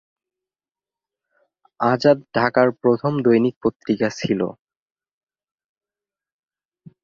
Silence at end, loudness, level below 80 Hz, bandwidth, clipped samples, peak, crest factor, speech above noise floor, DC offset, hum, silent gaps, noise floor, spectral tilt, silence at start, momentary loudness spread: 2.5 s; -19 LUFS; -60 dBFS; 7.4 kHz; under 0.1%; -2 dBFS; 20 dB; over 71 dB; under 0.1%; none; 3.56-3.61 s, 3.76-3.80 s; under -90 dBFS; -7 dB/octave; 1.8 s; 6 LU